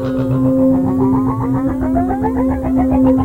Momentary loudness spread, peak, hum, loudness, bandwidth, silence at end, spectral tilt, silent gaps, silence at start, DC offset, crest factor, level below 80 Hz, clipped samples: 4 LU; -2 dBFS; none; -15 LUFS; 4.1 kHz; 0 s; -10 dB/octave; none; 0 s; 0.3%; 12 dB; -30 dBFS; under 0.1%